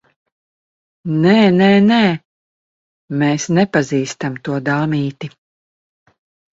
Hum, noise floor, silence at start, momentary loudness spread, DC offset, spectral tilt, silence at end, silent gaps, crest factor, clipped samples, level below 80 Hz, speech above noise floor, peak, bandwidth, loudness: none; under -90 dBFS; 1.05 s; 15 LU; under 0.1%; -6 dB/octave; 1.3 s; 2.25-3.08 s; 16 dB; under 0.1%; -56 dBFS; over 76 dB; 0 dBFS; 7.8 kHz; -15 LUFS